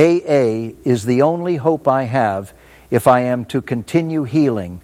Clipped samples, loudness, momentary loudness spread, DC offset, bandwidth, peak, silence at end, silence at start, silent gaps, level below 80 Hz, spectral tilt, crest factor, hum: under 0.1%; -17 LUFS; 8 LU; under 0.1%; 16 kHz; 0 dBFS; 0.05 s; 0 s; none; -52 dBFS; -7 dB/octave; 16 dB; none